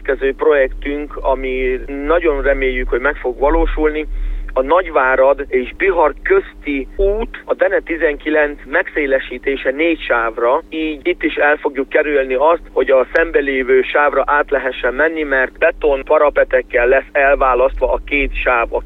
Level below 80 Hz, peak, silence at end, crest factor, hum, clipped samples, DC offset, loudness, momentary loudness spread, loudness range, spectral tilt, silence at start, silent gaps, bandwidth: -28 dBFS; 0 dBFS; 0 s; 16 dB; none; under 0.1%; under 0.1%; -15 LUFS; 6 LU; 3 LU; -7.5 dB/octave; 0 s; none; 4.4 kHz